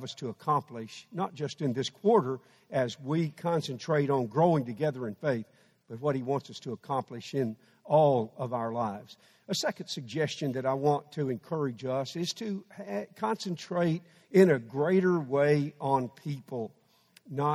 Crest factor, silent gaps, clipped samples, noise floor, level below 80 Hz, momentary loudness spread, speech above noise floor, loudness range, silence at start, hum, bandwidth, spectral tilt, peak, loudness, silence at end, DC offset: 22 dB; none; under 0.1%; -63 dBFS; -74 dBFS; 13 LU; 33 dB; 5 LU; 0 s; none; 14 kHz; -6.5 dB/octave; -8 dBFS; -30 LUFS; 0 s; under 0.1%